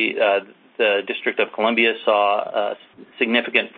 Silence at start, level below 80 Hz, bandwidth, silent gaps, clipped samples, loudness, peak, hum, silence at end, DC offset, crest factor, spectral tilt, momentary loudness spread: 0 s; -70 dBFS; 4.7 kHz; none; under 0.1%; -20 LUFS; -2 dBFS; none; 0.1 s; under 0.1%; 18 dB; -8 dB/octave; 7 LU